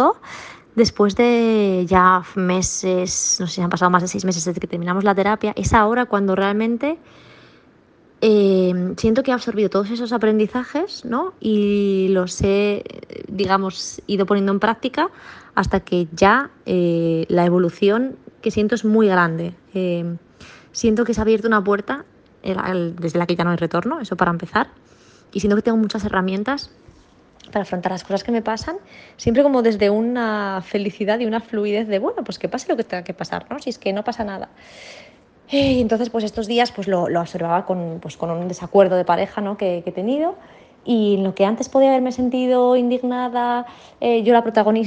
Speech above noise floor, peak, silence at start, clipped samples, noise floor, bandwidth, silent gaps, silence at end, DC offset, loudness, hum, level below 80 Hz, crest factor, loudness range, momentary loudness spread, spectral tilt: 33 dB; 0 dBFS; 0 s; under 0.1%; -52 dBFS; 10 kHz; none; 0 s; under 0.1%; -19 LUFS; none; -46 dBFS; 18 dB; 5 LU; 12 LU; -5 dB/octave